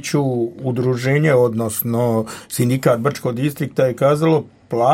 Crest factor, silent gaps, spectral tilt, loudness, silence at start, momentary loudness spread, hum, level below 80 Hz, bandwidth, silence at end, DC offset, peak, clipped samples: 16 dB; none; -6.5 dB/octave; -18 LUFS; 0 s; 7 LU; none; -58 dBFS; 16.5 kHz; 0 s; under 0.1%; -2 dBFS; under 0.1%